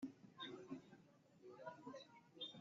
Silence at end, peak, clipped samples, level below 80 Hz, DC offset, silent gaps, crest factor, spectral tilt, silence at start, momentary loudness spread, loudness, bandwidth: 0 s; -40 dBFS; under 0.1%; under -90 dBFS; under 0.1%; none; 18 dB; -2.5 dB/octave; 0 s; 12 LU; -57 LUFS; 7.4 kHz